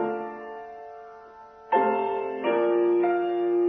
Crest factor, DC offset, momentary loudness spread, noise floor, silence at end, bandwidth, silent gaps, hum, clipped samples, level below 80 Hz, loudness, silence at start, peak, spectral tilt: 16 dB; under 0.1%; 20 LU; -47 dBFS; 0 s; 3.8 kHz; none; none; under 0.1%; -72 dBFS; -25 LUFS; 0 s; -10 dBFS; -8 dB/octave